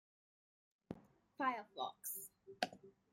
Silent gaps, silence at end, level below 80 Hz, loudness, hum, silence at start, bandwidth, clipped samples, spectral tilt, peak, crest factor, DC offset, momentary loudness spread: none; 0.2 s; -86 dBFS; -44 LUFS; none; 0.9 s; 16.5 kHz; under 0.1%; -2.5 dB/octave; -20 dBFS; 28 dB; under 0.1%; 15 LU